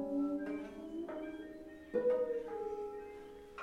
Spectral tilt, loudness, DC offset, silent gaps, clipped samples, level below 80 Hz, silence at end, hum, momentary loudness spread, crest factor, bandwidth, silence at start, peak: -7 dB/octave; -40 LUFS; under 0.1%; none; under 0.1%; -68 dBFS; 0 s; none; 16 LU; 16 dB; 10.5 kHz; 0 s; -24 dBFS